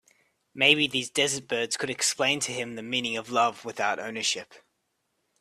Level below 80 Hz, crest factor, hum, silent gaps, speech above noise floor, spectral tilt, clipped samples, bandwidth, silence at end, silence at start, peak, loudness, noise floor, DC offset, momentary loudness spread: -72 dBFS; 24 dB; none; none; 49 dB; -1.5 dB/octave; under 0.1%; 15 kHz; 0.85 s; 0.55 s; -4 dBFS; -26 LUFS; -77 dBFS; under 0.1%; 9 LU